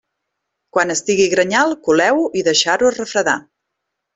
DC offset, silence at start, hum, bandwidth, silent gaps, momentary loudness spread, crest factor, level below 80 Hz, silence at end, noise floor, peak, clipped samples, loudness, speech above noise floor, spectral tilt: under 0.1%; 0.75 s; none; 8.4 kHz; none; 5 LU; 16 dB; -58 dBFS; 0.75 s; -77 dBFS; -2 dBFS; under 0.1%; -16 LUFS; 62 dB; -2.5 dB/octave